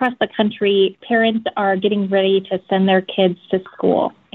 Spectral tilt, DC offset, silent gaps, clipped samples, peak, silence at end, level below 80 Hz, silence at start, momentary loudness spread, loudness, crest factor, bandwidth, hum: -4 dB/octave; under 0.1%; none; under 0.1%; -2 dBFS; 0.25 s; -60 dBFS; 0 s; 4 LU; -18 LUFS; 14 dB; 4.2 kHz; none